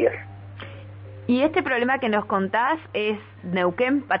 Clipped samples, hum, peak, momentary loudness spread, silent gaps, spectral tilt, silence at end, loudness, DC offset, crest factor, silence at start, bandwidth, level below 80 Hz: under 0.1%; none; -6 dBFS; 18 LU; none; -9.5 dB/octave; 0 s; -23 LUFS; under 0.1%; 18 dB; 0 s; 5.4 kHz; -60 dBFS